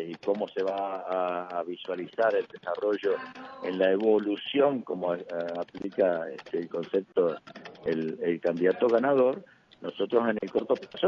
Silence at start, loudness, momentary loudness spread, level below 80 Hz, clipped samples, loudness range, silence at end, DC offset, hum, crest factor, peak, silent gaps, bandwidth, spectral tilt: 0 s; -29 LUFS; 10 LU; -74 dBFS; under 0.1%; 3 LU; 0 s; under 0.1%; none; 18 dB; -10 dBFS; none; 6.8 kHz; -7 dB/octave